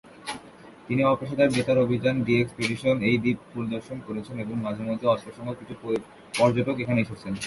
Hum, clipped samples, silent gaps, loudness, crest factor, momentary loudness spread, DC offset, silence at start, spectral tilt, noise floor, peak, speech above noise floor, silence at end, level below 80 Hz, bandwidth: none; under 0.1%; none; -26 LUFS; 18 dB; 13 LU; under 0.1%; 0.05 s; -6.5 dB/octave; -48 dBFS; -8 dBFS; 22 dB; 0 s; -58 dBFS; 11.5 kHz